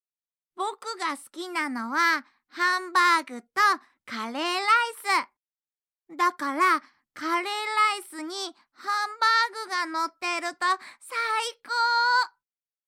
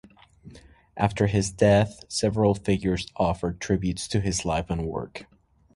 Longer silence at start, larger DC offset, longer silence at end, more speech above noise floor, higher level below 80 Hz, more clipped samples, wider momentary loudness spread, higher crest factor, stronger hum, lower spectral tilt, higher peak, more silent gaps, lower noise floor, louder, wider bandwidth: about the same, 0.55 s vs 0.45 s; neither; about the same, 0.6 s vs 0.5 s; first, over 64 dB vs 25 dB; second, under -90 dBFS vs -42 dBFS; neither; about the same, 12 LU vs 10 LU; about the same, 18 dB vs 20 dB; neither; second, 0 dB/octave vs -5.5 dB/octave; second, -10 dBFS vs -6 dBFS; neither; first, under -90 dBFS vs -50 dBFS; about the same, -25 LUFS vs -25 LUFS; first, 16.5 kHz vs 11.5 kHz